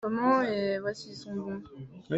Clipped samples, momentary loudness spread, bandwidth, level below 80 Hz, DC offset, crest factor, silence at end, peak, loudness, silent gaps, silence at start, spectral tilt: under 0.1%; 17 LU; 8.2 kHz; -68 dBFS; under 0.1%; 16 dB; 0 s; -14 dBFS; -30 LUFS; none; 0 s; -6.5 dB/octave